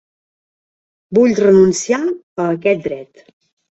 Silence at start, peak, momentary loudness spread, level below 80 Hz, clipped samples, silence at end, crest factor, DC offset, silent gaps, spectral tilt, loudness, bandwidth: 1.1 s; -2 dBFS; 11 LU; -56 dBFS; under 0.1%; 0.7 s; 16 dB; under 0.1%; 2.23-2.36 s; -5.5 dB/octave; -14 LUFS; 8.2 kHz